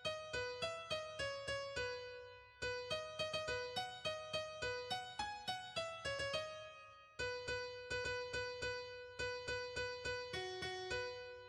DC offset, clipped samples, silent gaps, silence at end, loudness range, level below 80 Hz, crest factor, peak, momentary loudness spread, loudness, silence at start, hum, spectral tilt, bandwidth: under 0.1%; under 0.1%; none; 0 s; 1 LU; -66 dBFS; 16 dB; -30 dBFS; 5 LU; -44 LUFS; 0 s; none; -2.5 dB/octave; 13 kHz